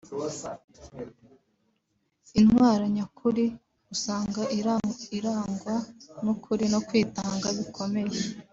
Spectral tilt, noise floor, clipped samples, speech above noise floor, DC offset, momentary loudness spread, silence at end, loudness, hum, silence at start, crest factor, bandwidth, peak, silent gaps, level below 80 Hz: -5.5 dB/octave; -75 dBFS; under 0.1%; 48 dB; under 0.1%; 18 LU; 0.1 s; -27 LUFS; none; 0.05 s; 18 dB; 7.8 kHz; -10 dBFS; 0.64-0.68 s; -58 dBFS